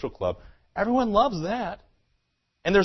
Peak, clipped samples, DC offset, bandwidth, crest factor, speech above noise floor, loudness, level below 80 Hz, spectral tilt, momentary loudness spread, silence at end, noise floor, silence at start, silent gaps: -8 dBFS; under 0.1%; under 0.1%; 6.2 kHz; 18 dB; 49 dB; -26 LUFS; -48 dBFS; -6.5 dB/octave; 16 LU; 0 s; -74 dBFS; 0 s; none